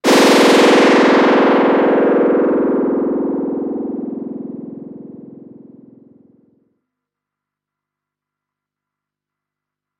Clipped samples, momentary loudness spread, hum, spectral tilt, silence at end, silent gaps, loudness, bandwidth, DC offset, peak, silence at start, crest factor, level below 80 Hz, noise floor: under 0.1%; 20 LU; 50 Hz at -75 dBFS; -4 dB/octave; 4.7 s; none; -13 LUFS; 16 kHz; under 0.1%; -2 dBFS; 0.05 s; 16 dB; -62 dBFS; -84 dBFS